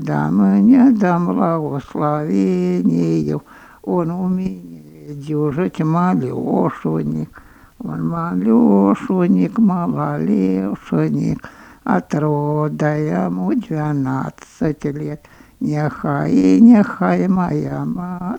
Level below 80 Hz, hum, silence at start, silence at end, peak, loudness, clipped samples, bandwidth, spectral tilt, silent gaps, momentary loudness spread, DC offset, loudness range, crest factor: -50 dBFS; none; 0 s; 0 s; 0 dBFS; -17 LUFS; under 0.1%; 8.6 kHz; -9 dB/octave; none; 13 LU; under 0.1%; 5 LU; 16 dB